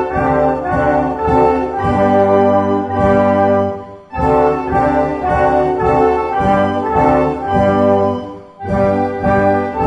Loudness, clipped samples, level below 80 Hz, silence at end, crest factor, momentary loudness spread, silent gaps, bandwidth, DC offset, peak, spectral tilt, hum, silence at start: -14 LUFS; under 0.1%; -32 dBFS; 0 s; 14 dB; 4 LU; none; 9.6 kHz; under 0.1%; 0 dBFS; -8.5 dB/octave; none; 0 s